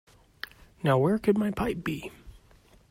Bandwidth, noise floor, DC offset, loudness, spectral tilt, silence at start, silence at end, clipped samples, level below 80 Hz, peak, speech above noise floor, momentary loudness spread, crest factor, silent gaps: 16 kHz; -58 dBFS; under 0.1%; -27 LUFS; -7.5 dB/octave; 0.85 s; 0.55 s; under 0.1%; -54 dBFS; -10 dBFS; 32 dB; 19 LU; 18 dB; none